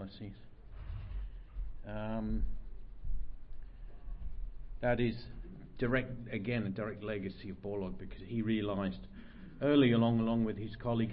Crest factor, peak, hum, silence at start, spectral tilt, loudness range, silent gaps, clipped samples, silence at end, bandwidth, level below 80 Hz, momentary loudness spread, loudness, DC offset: 20 dB; -16 dBFS; none; 0 s; -6 dB/octave; 11 LU; none; under 0.1%; 0 s; 5.2 kHz; -44 dBFS; 22 LU; -35 LUFS; under 0.1%